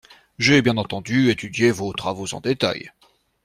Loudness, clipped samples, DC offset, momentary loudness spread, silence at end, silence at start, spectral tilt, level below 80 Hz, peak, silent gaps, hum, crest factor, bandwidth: -20 LUFS; under 0.1%; under 0.1%; 10 LU; 0.55 s; 0.4 s; -5 dB/octave; -54 dBFS; -4 dBFS; none; none; 18 dB; 14.5 kHz